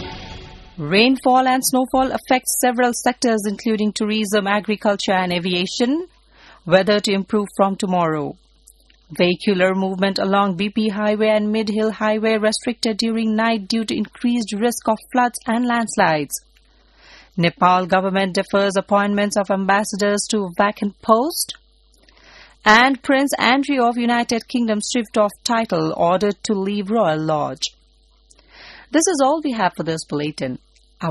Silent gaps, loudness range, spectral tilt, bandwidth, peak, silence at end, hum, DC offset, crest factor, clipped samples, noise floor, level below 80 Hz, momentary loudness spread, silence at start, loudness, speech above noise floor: none; 3 LU; -4 dB/octave; 12.5 kHz; 0 dBFS; 0 s; none; under 0.1%; 20 dB; under 0.1%; -55 dBFS; -52 dBFS; 8 LU; 0 s; -19 LUFS; 36 dB